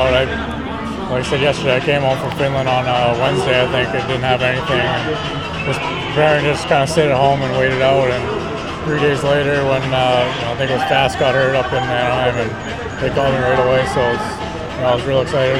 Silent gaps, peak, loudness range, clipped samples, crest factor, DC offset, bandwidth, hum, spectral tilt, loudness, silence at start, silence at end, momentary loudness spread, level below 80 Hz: none; 0 dBFS; 2 LU; under 0.1%; 16 dB; under 0.1%; 13 kHz; none; -5.5 dB/octave; -16 LUFS; 0 s; 0 s; 7 LU; -36 dBFS